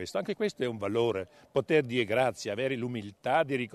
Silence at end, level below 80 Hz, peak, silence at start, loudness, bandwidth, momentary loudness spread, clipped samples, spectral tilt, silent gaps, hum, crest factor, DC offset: 0.05 s; -68 dBFS; -12 dBFS; 0 s; -30 LUFS; 13.5 kHz; 7 LU; under 0.1%; -5.5 dB/octave; none; none; 18 dB; under 0.1%